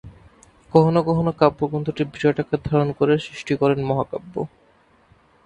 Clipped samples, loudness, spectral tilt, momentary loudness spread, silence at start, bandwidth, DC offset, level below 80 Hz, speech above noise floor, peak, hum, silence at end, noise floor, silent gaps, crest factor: under 0.1%; -21 LUFS; -8 dB/octave; 11 LU; 0.05 s; 9.2 kHz; under 0.1%; -50 dBFS; 37 dB; 0 dBFS; none; 1 s; -57 dBFS; none; 22 dB